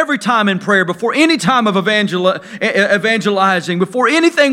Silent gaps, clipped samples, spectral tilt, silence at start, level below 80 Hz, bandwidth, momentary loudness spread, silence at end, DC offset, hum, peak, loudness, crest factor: none; under 0.1%; -4.5 dB/octave; 0 s; -64 dBFS; 15 kHz; 5 LU; 0 s; under 0.1%; none; 0 dBFS; -13 LUFS; 14 dB